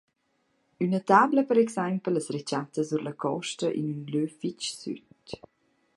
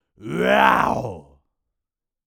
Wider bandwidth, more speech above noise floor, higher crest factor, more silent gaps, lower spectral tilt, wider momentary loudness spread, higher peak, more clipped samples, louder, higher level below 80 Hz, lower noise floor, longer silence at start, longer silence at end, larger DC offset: second, 11.5 kHz vs over 20 kHz; second, 46 dB vs 65 dB; about the same, 22 dB vs 20 dB; neither; about the same, -5.5 dB/octave vs -5.5 dB/octave; first, 18 LU vs 15 LU; second, -6 dBFS vs -2 dBFS; neither; second, -27 LUFS vs -18 LUFS; second, -72 dBFS vs -50 dBFS; second, -73 dBFS vs -84 dBFS; first, 0.8 s vs 0.2 s; second, 0.6 s vs 1.05 s; neither